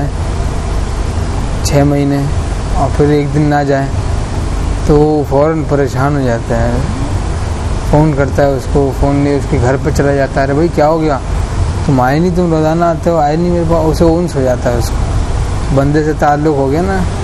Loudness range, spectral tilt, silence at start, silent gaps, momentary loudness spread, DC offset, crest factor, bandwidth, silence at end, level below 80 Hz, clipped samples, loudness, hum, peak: 2 LU; -7 dB/octave; 0 s; none; 7 LU; under 0.1%; 12 dB; 13 kHz; 0 s; -18 dBFS; under 0.1%; -13 LUFS; none; 0 dBFS